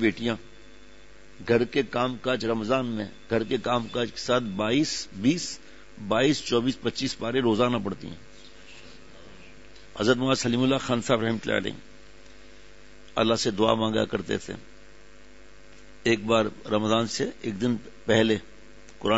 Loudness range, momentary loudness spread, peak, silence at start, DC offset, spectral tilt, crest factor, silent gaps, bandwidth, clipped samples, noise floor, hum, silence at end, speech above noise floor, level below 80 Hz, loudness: 2 LU; 13 LU; -6 dBFS; 0 s; 0.5%; -5 dB/octave; 20 dB; none; 8 kHz; under 0.1%; -52 dBFS; none; 0 s; 27 dB; -56 dBFS; -26 LUFS